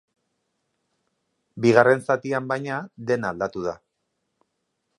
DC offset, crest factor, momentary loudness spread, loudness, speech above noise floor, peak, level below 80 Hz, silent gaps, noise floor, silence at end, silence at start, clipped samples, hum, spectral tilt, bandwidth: under 0.1%; 24 dB; 14 LU; -23 LUFS; 55 dB; 0 dBFS; -64 dBFS; none; -77 dBFS; 1.2 s; 1.55 s; under 0.1%; none; -6.5 dB/octave; 11.5 kHz